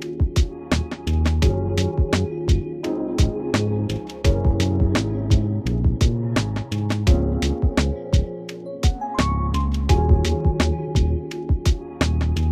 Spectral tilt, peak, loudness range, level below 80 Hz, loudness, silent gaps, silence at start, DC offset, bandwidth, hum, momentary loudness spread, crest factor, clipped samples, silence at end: -6.5 dB/octave; -4 dBFS; 1 LU; -24 dBFS; -22 LUFS; none; 0 s; under 0.1%; 12.5 kHz; none; 5 LU; 16 dB; under 0.1%; 0 s